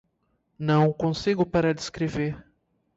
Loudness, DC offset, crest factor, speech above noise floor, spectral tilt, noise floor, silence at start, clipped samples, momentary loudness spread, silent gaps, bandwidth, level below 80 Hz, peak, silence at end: -25 LUFS; under 0.1%; 16 dB; 48 dB; -6.5 dB/octave; -72 dBFS; 0.6 s; under 0.1%; 10 LU; none; 8 kHz; -52 dBFS; -10 dBFS; 0.55 s